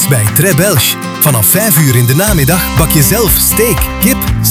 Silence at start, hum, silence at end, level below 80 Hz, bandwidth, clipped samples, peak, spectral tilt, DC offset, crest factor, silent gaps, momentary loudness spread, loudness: 0 s; none; 0 s; -22 dBFS; over 20 kHz; 0.7%; 0 dBFS; -4 dB/octave; 0.3%; 10 dB; none; 4 LU; -8 LUFS